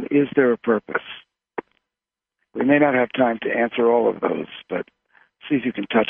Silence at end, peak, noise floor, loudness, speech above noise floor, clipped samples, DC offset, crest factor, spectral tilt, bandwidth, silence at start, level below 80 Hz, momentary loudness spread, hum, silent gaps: 0 s; -4 dBFS; -88 dBFS; -21 LUFS; 68 dB; under 0.1%; under 0.1%; 18 dB; -9.5 dB/octave; 3.7 kHz; 0 s; -66 dBFS; 18 LU; none; none